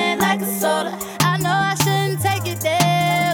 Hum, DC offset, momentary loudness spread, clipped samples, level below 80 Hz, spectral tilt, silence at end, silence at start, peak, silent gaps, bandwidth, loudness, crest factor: none; under 0.1%; 4 LU; under 0.1%; -54 dBFS; -4 dB/octave; 0 s; 0 s; -4 dBFS; none; 19.5 kHz; -19 LUFS; 14 dB